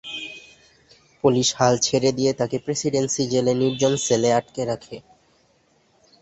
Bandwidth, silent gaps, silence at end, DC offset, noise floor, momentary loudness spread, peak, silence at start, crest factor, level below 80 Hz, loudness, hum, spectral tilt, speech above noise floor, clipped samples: 8.4 kHz; none; 1.2 s; under 0.1%; -62 dBFS; 13 LU; -4 dBFS; 0.05 s; 18 dB; -58 dBFS; -21 LUFS; none; -4 dB/octave; 41 dB; under 0.1%